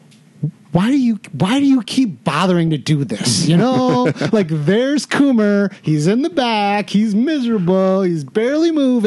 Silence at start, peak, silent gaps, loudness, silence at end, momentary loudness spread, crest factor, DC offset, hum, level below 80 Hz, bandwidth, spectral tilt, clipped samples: 0.4 s; -2 dBFS; none; -16 LUFS; 0 s; 5 LU; 14 dB; under 0.1%; none; -56 dBFS; 12 kHz; -6 dB/octave; under 0.1%